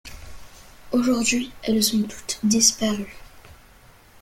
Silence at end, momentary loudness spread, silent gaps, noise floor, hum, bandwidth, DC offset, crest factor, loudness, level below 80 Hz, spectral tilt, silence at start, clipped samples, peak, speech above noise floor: 0.7 s; 12 LU; none; -51 dBFS; none; 16.5 kHz; under 0.1%; 22 dB; -21 LUFS; -50 dBFS; -2.5 dB/octave; 0.05 s; under 0.1%; -4 dBFS; 29 dB